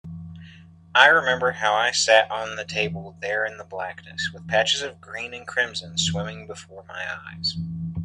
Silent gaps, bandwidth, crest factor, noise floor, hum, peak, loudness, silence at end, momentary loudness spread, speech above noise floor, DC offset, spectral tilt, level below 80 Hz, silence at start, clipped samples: none; 11 kHz; 24 dB; -47 dBFS; none; 0 dBFS; -22 LUFS; 0 s; 17 LU; 23 dB; under 0.1%; -2.5 dB/octave; -60 dBFS; 0.05 s; under 0.1%